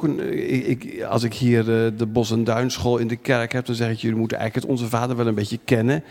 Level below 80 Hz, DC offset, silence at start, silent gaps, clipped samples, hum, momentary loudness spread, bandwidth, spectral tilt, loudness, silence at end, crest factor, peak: -52 dBFS; under 0.1%; 0 s; none; under 0.1%; none; 5 LU; 16.5 kHz; -6.5 dB/octave; -22 LUFS; 0 s; 18 dB; -2 dBFS